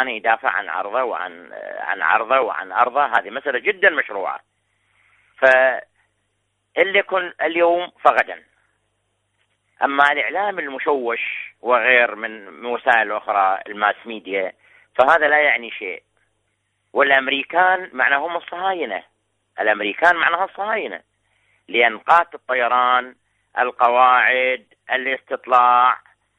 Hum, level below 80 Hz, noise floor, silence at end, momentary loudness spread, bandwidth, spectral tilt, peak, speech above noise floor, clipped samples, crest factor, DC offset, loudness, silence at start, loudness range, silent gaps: none; -66 dBFS; -71 dBFS; 0.4 s; 14 LU; 9.6 kHz; -4 dB/octave; 0 dBFS; 52 dB; under 0.1%; 18 dB; under 0.1%; -18 LUFS; 0 s; 3 LU; none